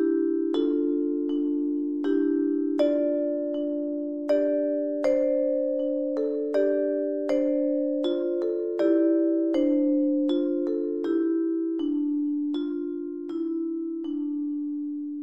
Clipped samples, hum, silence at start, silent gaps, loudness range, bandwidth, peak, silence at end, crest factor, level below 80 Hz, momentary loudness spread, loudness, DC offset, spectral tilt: under 0.1%; none; 0 s; none; 4 LU; 7 kHz; -12 dBFS; 0 s; 14 dB; -70 dBFS; 7 LU; -26 LUFS; 0.1%; -6 dB/octave